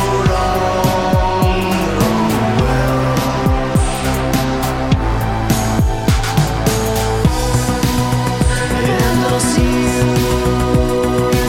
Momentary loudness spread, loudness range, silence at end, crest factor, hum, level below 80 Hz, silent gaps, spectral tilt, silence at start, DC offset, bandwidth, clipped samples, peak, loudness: 2 LU; 1 LU; 0 s; 12 dB; none; -22 dBFS; none; -5.5 dB/octave; 0 s; under 0.1%; 16.5 kHz; under 0.1%; -2 dBFS; -15 LUFS